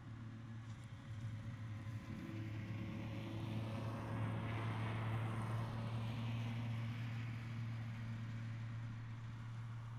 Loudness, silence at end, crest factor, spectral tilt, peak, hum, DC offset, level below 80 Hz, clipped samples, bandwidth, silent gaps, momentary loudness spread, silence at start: -46 LUFS; 0 s; 14 dB; -7.5 dB/octave; -32 dBFS; none; under 0.1%; -64 dBFS; under 0.1%; 10.5 kHz; none; 7 LU; 0 s